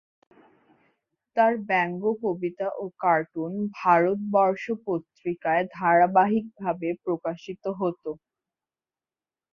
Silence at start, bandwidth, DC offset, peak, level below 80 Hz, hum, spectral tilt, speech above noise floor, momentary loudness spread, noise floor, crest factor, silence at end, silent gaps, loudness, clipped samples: 1.35 s; 6.8 kHz; under 0.1%; -8 dBFS; -70 dBFS; none; -8 dB/octave; over 65 dB; 11 LU; under -90 dBFS; 18 dB; 1.35 s; none; -25 LUFS; under 0.1%